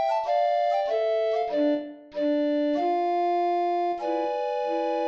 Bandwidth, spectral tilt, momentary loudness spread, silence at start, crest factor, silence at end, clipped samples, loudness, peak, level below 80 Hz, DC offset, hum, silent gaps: 7.4 kHz; -4.5 dB/octave; 4 LU; 0 s; 10 dB; 0 s; under 0.1%; -26 LUFS; -14 dBFS; -72 dBFS; under 0.1%; none; none